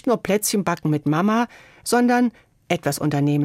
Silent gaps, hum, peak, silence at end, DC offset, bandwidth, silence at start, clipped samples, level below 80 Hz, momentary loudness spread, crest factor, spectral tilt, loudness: none; none; -6 dBFS; 0 s; under 0.1%; 16.5 kHz; 0.05 s; under 0.1%; -58 dBFS; 6 LU; 14 dB; -5.5 dB/octave; -21 LUFS